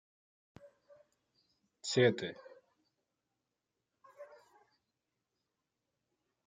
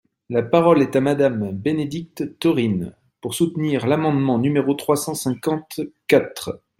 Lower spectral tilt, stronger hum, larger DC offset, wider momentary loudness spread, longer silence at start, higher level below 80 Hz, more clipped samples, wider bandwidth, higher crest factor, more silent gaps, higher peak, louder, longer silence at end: about the same, -5 dB/octave vs -6 dB/octave; neither; neither; first, 26 LU vs 12 LU; first, 1.85 s vs 0.3 s; second, -84 dBFS vs -58 dBFS; neither; second, 9.6 kHz vs 16.5 kHz; first, 26 dB vs 18 dB; neither; second, -16 dBFS vs -2 dBFS; second, -33 LUFS vs -20 LUFS; first, 2.2 s vs 0.25 s